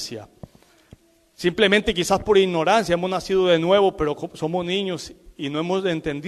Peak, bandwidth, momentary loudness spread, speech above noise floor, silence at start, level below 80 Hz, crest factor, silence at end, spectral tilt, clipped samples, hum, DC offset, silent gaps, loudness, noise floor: -4 dBFS; 13.5 kHz; 12 LU; 31 dB; 0 s; -48 dBFS; 18 dB; 0 s; -4.5 dB/octave; under 0.1%; none; under 0.1%; none; -21 LUFS; -52 dBFS